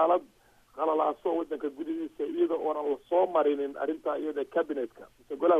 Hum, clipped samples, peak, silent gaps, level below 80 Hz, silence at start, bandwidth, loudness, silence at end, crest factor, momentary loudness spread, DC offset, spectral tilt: none; under 0.1%; -12 dBFS; none; -70 dBFS; 0 s; 7.6 kHz; -30 LUFS; 0 s; 18 dB; 9 LU; under 0.1%; -6.5 dB/octave